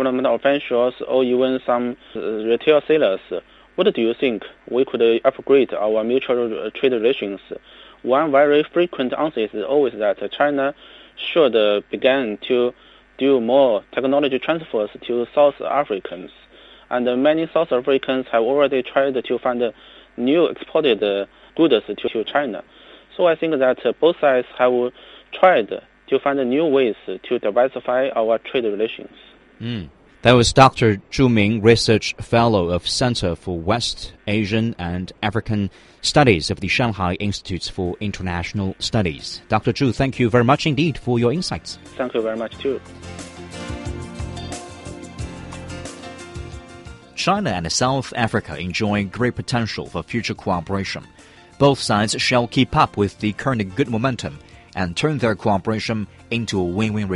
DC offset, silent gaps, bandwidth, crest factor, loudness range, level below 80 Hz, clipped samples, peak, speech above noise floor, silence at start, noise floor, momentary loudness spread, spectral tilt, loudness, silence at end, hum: under 0.1%; none; 11.5 kHz; 20 dB; 5 LU; -44 dBFS; under 0.1%; 0 dBFS; 21 dB; 0 s; -40 dBFS; 15 LU; -5.5 dB/octave; -19 LUFS; 0 s; none